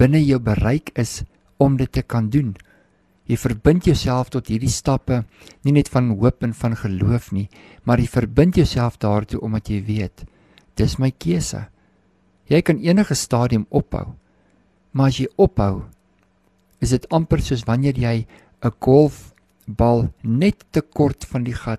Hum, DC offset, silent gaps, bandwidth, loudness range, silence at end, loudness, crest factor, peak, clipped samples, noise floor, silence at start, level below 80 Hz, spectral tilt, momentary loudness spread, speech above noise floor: none; under 0.1%; none; 13.5 kHz; 3 LU; 0 s; -20 LUFS; 18 dB; -2 dBFS; under 0.1%; -60 dBFS; 0 s; -34 dBFS; -7 dB/octave; 11 LU; 42 dB